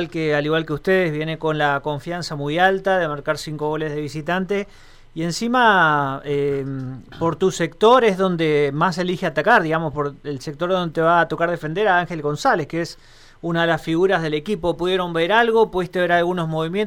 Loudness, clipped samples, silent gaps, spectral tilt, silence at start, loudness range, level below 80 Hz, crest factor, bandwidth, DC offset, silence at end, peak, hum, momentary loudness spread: -20 LUFS; under 0.1%; none; -5.5 dB/octave; 0 s; 3 LU; -48 dBFS; 16 dB; 16 kHz; under 0.1%; 0 s; -4 dBFS; none; 10 LU